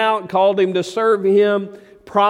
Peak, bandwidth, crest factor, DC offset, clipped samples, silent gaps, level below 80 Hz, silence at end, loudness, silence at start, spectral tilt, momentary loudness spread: -2 dBFS; 11.5 kHz; 14 dB; under 0.1%; under 0.1%; none; -64 dBFS; 0 s; -17 LUFS; 0 s; -5.5 dB/octave; 8 LU